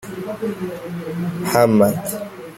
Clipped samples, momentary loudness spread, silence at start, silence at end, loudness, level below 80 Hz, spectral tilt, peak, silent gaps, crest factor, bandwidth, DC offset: under 0.1%; 15 LU; 0 s; 0 s; -20 LUFS; -56 dBFS; -6 dB/octave; -2 dBFS; none; 18 dB; 16.5 kHz; under 0.1%